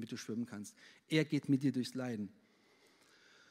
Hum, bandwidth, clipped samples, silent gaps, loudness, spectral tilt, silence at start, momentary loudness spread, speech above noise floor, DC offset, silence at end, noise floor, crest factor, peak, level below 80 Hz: none; 15.5 kHz; under 0.1%; none; -38 LUFS; -6 dB/octave; 0 s; 14 LU; 31 dB; under 0.1%; 1.2 s; -69 dBFS; 20 dB; -18 dBFS; -88 dBFS